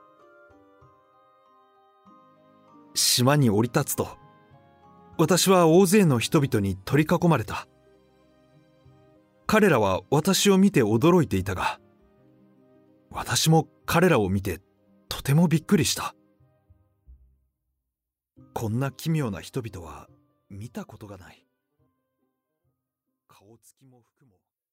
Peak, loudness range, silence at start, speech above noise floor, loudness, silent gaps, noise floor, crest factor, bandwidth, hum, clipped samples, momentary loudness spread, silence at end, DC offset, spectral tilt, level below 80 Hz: -6 dBFS; 11 LU; 2.95 s; 64 dB; -22 LUFS; none; -87 dBFS; 20 dB; 16 kHz; none; under 0.1%; 20 LU; 3.55 s; under 0.1%; -5 dB/octave; -56 dBFS